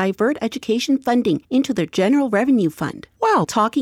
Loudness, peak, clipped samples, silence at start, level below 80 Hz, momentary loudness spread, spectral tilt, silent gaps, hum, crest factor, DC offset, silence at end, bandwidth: -19 LUFS; -6 dBFS; under 0.1%; 0 s; -58 dBFS; 6 LU; -5.5 dB/octave; none; none; 14 dB; under 0.1%; 0 s; 15.5 kHz